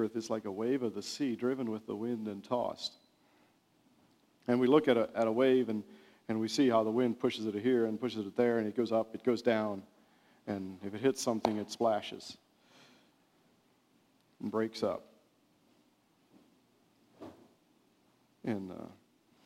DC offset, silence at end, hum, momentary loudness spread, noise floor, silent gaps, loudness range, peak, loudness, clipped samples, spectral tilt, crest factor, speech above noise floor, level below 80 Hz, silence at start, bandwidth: under 0.1%; 0.55 s; none; 17 LU; -70 dBFS; none; 11 LU; -12 dBFS; -33 LUFS; under 0.1%; -5.5 dB/octave; 22 dB; 38 dB; -78 dBFS; 0 s; 15.5 kHz